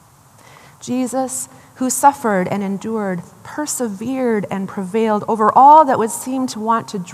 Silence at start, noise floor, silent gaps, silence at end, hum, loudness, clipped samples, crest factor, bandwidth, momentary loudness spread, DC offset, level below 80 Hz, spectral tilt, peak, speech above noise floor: 0.8 s; -47 dBFS; none; 0 s; none; -16 LUFS; under 0.1%; 16 dB; 15 kHz; 14 LU; under 0.1%; -66 dBFS; -4.5 dB/octave; 0 dBFS; 31 dB